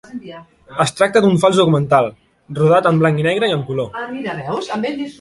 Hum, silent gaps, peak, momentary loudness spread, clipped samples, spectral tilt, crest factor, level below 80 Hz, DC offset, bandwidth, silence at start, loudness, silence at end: none; none; -2 dBFS; 14 LU; under 0.1%; -6 dB/octave; 16 dB; -54 dBFS; under 0.1%; 11.5 kHz; 0.1 s; -16 LUFS; 0.1 s